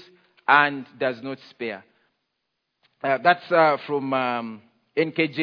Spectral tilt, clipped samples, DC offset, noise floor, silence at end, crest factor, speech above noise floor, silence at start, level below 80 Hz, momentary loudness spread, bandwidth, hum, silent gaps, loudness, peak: -7.5 dB/octave; under 0.1%; under 0.1%; -78 dBFS; 0 s; 22 dB; 56 dB; 0.5 s; -80 dBFS; 15 LU; 5.4 kHz; none; none; -23 LUFS; -2 dBFS